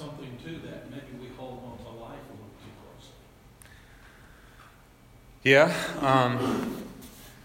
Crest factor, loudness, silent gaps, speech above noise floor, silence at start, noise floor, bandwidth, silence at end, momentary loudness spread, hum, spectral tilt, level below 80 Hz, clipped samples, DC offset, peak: 24 dB; -24 LUFS; none; 31 dB; 0 s; -54 dBFS; 16 kHz; 0.1 s; 27 LU; none; -5.5 dB/octave; -58 dBFS; under 0.1%; under 0.1%; -6 dBFS